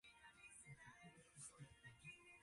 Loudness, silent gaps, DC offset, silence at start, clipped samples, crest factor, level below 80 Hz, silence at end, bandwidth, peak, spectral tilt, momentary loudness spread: -62 LUFS; none; under 0.1%; 0.05 s; under 0.1%; 16 dB; -82 dBFS; 0 s; 11.5 kHz; -48 dBFS; -3 dB/octave; 5 LU